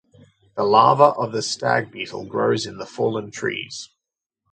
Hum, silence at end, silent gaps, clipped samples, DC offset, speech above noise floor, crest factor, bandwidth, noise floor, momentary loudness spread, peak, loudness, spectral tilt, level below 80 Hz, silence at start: none; 0.65 s; none; under 0.1%; under 0.1%; 65 dB; 22 dB; 9.4 kHz; -85 dBFS; 16 LU; 0 dBFS; -20 LUFS; -4.5 dB/octave; -64 dBFS; 0.55 s